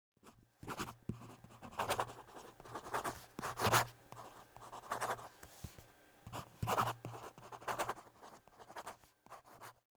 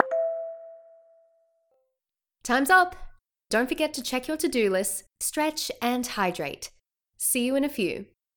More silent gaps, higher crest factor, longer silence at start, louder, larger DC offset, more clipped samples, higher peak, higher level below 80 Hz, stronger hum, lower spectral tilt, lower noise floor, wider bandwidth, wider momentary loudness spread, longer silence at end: neither; about the same, 26 dB vs 26 dB; first, 0.25 s vs 0 s; second, -41 LUFS vs -26 LUFS; neither; neither; second, -16 dBFS vs -2 dBFS; second, -66 dBFS vs -56 dBFS; neither; about the same, -3.5 dB/octave vs -2.5 dB/octave; second, -62 dBFS vs -87 dBFS; about the same, over 20 kHz vs 19 kHz; first, 22 LU vs 15 LU; about the same, 0.25 s vs 0.35 s